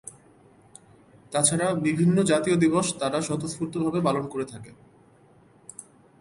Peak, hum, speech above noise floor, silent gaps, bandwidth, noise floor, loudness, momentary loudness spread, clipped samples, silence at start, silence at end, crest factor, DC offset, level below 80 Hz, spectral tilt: -6 dBFS; none; 32 dB; none; 11.5 kHz; -56 dBFS; -24 LUFS; 22 LU; under 0.1%; 0.05 s; 0.4 s; 22 dB; under 0.1%; -62 dBFS; -5 dB/octave